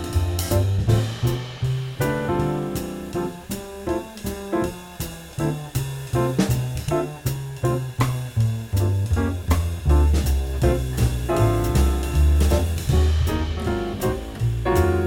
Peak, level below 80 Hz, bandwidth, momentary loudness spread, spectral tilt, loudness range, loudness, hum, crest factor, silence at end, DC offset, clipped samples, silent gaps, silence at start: -6 dBFS; -26 dBFS; 17.5 kHz; 8 LU; -6.5 dB/octave; 6 LU; -23 LUFS; none; 16 dB; 0 s; under 0.1%; under 0.1%; none; 0 s